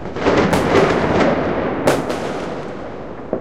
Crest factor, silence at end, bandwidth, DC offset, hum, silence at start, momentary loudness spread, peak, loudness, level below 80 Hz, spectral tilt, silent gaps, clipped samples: 18 dB; 0 s; 16 kHz; 2%; none; 0 s; 15 LU; 0 dBFS; -17 LUFS; -40 dBFS; -6 dB/octave; none; under 0.1%